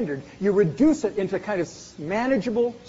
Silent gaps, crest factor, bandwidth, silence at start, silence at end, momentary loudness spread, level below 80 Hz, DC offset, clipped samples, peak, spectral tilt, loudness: none; 14 dB; 8 kHz; 0 s; 0 s; 10 LU; -54 dBFS; under 0.1%; under 0.1%; -8 dBFS; -6.5 dB/octave; -24 LUFS